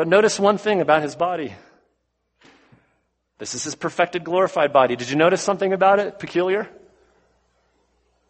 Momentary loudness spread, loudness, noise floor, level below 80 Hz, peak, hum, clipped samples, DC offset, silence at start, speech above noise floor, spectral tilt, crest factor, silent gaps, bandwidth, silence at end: 11 LU; -20 LUFS; -72 dBFS; -64 dBFS; -2 dBFS; none; under 0.1%; under 0.1%; 0 s; 52 dB; -4 dB/octave; 20 dB; none; 8.8 kHz; 1.6 s